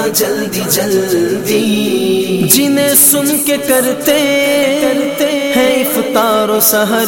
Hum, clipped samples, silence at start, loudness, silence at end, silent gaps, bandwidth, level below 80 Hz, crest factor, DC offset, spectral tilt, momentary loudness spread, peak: none; under 0.1%; 0 s; -11 LUFS; 0 s; none; 17 kHz; -50 dBFS; 12 dB; under 0.1%; -3 dB/octave; 6 LU; 0 dBFS